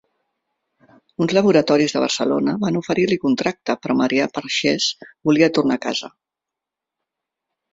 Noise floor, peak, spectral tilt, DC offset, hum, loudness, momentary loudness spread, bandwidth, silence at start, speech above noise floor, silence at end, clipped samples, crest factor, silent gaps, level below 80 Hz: -85 dBFS; -2 dBFS; -4.5 dB/octave; under 0.1%; none; -19 LUFS; 9 LU; 7.8 kHz; 1.2 s; 67 dB; 1.65 s; under 0.1%; 18 dB; none; -60 dBFS